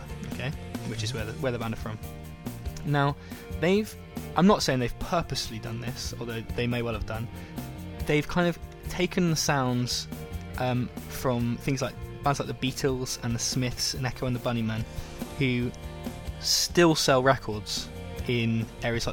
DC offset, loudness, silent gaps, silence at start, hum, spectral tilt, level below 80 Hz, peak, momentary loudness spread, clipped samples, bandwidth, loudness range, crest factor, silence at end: under 0.1%; -28 LUFS; none; 0 s; none; -4.5 dB/octave; -44 dBFS; -6 dBFS; 15 LU; under 0.1%; 19.5 kHz; 5 LU; 22 dB; 0 s